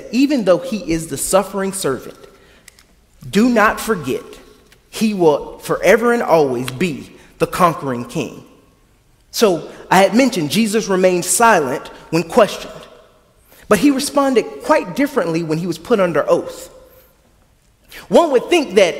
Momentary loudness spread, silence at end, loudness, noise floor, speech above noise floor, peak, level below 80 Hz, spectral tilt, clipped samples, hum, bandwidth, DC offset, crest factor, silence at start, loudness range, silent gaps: 11 LU; 0 s; -16 LUFS; -54 dBFS; 38 dB; 0 dBFS; -48 dBFS; -4.5 dB/octave; under 0.1%; none; 16.5 kHz; under 0.1%; 16 dB; 0 s; 5 LU; none